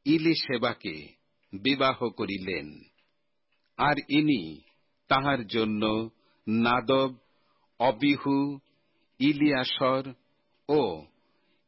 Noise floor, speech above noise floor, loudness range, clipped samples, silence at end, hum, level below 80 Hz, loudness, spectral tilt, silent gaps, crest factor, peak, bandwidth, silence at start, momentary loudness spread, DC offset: -78 dBFS; 51 dB; 3 LU; under 0.1%; 0.65 s; none; -62 dBFS; -27 LUFS; -9.5 dB/octave; none; 18 dB; -12 dBFS; 5.8 kHz; 0.05 s; 17 LU; under 0.1%